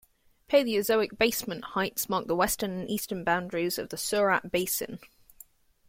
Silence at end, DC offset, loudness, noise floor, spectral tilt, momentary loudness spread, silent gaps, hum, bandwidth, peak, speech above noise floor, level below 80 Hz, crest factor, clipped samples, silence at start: 0.85 s; under 0.1%; -28 LUFS; -56 dBFS; -3.5 dB/octave; 8 LU; none; none; 16.5 kHz; -10 dBFS; 28 dB; -58 dBFS; 20 dB; under 0.1%; 0.5 s